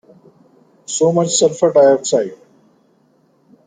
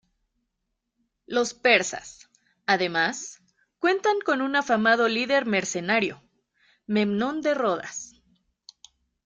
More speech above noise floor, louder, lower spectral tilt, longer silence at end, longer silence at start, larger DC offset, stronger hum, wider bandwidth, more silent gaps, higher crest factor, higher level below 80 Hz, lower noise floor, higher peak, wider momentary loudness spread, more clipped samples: second, 43 dB vs 56 dB; first, -14 LUFS vs -24 LUFS; about the same, -4 dB/octave vs -3.5 dB/octave; first, 1.3 s vs 1.15 s; second, 0.9 s vs 1.3 s; neither; neither; about the same, 9.6 kHz vs 9.6 kHz; neither; second, 16 dB vs 22 dB; about the same, -64 dBFS vs -68 dBFS; second, -56 dBFS vs -80 dBFS; about the same, -2 dBFS vs -4 dBFS; second, 10 LU vs 16 LU; neither